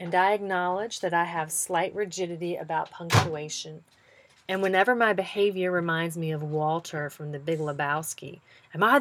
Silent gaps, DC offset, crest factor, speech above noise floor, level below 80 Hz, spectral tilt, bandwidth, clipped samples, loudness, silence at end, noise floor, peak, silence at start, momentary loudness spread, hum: none; under 0.1%; 22 dB; 31 dB; -64 dBFS; -4.5 dB/octave; 18.5 kHz; under 0.1%; -27 LUFS; 0 s; -58 dBFS; -6 dBFS; 0 s; 12 LU; none